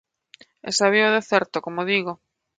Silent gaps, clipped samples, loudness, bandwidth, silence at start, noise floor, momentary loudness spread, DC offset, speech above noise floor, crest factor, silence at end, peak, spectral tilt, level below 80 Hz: none; under 0.1%; -21 LUFS; 9.4 kHz; 0.65 s; -53 dBFS; 17 LU; under 0.1%; 32 dB; 20 dB; 0.45 s; -2 dBFS; -3 dB/octave; -70 dBFS